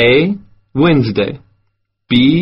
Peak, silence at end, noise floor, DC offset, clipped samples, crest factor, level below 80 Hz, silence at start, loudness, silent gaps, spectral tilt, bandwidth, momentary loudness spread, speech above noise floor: 0 dBFS; 0 s; -65 dBFS; under 0.1%; under 0.1%; 14 dB; -42 dBFS; 0 s; -14 LUFS; none; -5 dB/octave; 5.8 kHz; 14 LU; 53 dB